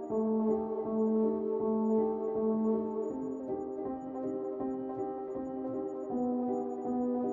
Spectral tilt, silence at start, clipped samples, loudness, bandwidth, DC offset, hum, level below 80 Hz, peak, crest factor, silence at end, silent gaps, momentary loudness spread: -11 dB/octave; 0 s; under 0.1%; -33 LUFS; 7.4 kHz; under 0.1%; none; -68 dBFS; -20 dBFS; 12 dB; 0 s; none; 8 LU